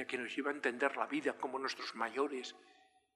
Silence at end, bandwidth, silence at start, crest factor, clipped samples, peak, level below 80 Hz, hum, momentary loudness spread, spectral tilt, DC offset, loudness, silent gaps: 0.45 s; 12.5 kHz; 0 s; 22 dB; under 0.1%; -18 dBFS; under -90 dBFS; none; 5 LU; -3 dB/octave; under 0.1%; -38 LUFS; none